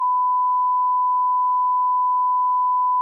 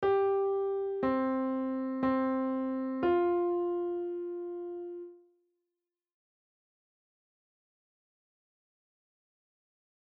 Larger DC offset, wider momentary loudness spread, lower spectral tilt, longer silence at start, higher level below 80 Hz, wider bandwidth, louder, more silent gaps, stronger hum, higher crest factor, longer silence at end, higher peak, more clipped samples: neither; second, 0 LU vs 12 LU; second, 4 dB/octave vs -5.5 dB/octave; about the same, 0 s vs 0 s; second, under -90 dBFS vs -68 dBFS; second, 1.2 kHz vs 4.7 kHz; first, -19 LUFS vs -32 LUFS; neither; neither; second, 4 dB vs 14 dB; second, 0 s vs 4.85 s; first, -16 dBFS vs -20 dBFS; neither